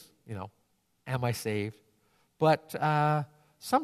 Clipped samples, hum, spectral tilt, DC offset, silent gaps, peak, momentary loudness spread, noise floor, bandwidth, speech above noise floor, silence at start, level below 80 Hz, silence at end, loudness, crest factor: under 0.1%; none; -6 dB/octave; under 0.1%; none; -12 dBFS; 18 LU; -69 dBFS; 14 kHz; 40 dB; 0.3 s; -70 dBFS; 0 s; -30 LUFS; 20 dB